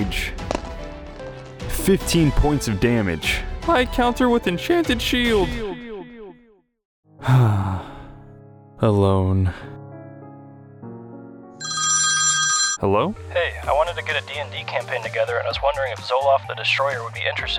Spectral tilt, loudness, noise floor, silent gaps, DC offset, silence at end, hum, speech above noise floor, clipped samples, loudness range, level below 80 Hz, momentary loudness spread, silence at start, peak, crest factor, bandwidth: -4 dB/octave; -20 LUFS; -55 dBFS; 6.85-7.03 s; under 0.1%; 0 s; none; 35 dB; under 0.1%; 5 LU; -34 dBFS; 21 LU; 0 s; -6 dBFS; 16 dB; 19 kHz